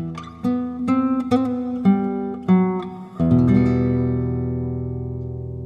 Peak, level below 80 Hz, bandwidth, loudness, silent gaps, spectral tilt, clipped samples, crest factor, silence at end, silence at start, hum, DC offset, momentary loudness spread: -4 dBFS; -40 dBFS; 7 kHz; -21 LUFS; none; -10 dB/octave; under 0.1%; 16 dB; 0 s; 0 s; none; under 0.1%; 11 LU